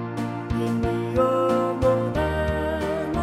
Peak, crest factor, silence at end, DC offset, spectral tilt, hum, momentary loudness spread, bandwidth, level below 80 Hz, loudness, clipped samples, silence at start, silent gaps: -8 dBFS; 16 dB; 0 s; under 0.1%; -7.5 dB/octave; none; 6 LU; 14 kHz; -36 dBFS; -24 LUFS; under 0.1%; 0 s; none